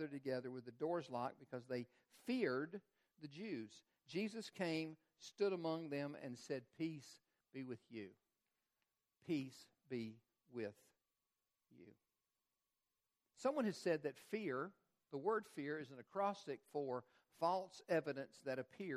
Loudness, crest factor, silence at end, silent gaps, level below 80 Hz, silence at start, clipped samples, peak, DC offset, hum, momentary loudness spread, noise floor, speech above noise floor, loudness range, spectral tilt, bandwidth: -46 LUFS; 20 dB; 0 s; none; under -90 dBFS; 0 s; under 0.1%; -26 dBFS; under 0.1%; none; 14 LU; under -90 dBFS; over 45 dB; 7 LU; -6 dB/octave; 14 kHz